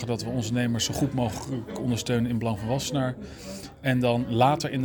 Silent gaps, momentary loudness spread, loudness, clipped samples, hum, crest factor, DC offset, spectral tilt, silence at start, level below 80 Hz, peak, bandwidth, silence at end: none; 11 LU; -27 LUFS; under 0.1%; none; 20 dB; under 0.1%; -5.5 dB/octave; 0 s; -50 dBFS; -6 dBFS; over 20 kHz; 0 s